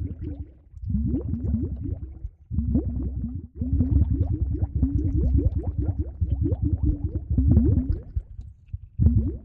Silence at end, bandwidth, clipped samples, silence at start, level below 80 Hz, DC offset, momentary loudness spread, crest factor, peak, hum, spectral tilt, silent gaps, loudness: 0 s; 1.5 kHz; under 0.1%; 0 s; -28 dBFS; under 0.1%; 17 LU; 18 dB; -6 dBFS; none; -14 dB/octave; none; -26 LUFS